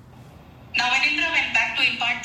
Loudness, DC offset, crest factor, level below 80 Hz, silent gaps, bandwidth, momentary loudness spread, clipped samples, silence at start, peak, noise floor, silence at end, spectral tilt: -20 LUFS; under 0.1%; 16 dB; -56 dBFS; none; 14.5 kHz; 4 LU; under 0.1%; 0.15 s; -8 dBFS; -45 dBFS; 0 s; -1.5 dB/octave